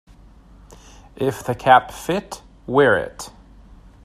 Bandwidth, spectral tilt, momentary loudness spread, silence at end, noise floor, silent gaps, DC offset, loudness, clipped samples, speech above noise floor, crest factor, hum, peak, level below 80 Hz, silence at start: 14.5 kHz; -5 dB/octave; 22 LU; 0.75 s; -46 dBFS; none; under 0.1%; -19 LUFS; under 0.1%; 28 dB; 22 dB; none; 0 dBFS; -48 dBFS; 1.2 s